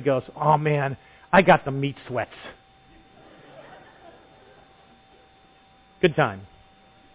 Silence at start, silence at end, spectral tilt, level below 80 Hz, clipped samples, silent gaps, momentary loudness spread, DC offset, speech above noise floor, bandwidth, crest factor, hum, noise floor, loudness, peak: 0 s; 0.7 s; -10.5 dB/octave; -56 dBFS; under 0.1%; none; 22 LU; under 0.1%; 34 dB; 4 kHz; 20 dB; none; -56 dBFS; -22 LUFS; -6 dBFS